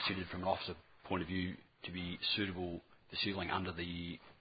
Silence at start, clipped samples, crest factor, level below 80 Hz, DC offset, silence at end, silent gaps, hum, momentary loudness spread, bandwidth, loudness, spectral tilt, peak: 0 s; under 0.1%; 22 dB; -58 dBFS; under 0.1%; 0.05 s; none; none; 11 LU; 5.2 kHz; -40 LUFS; -8.5 dB/octave; -20 dBFS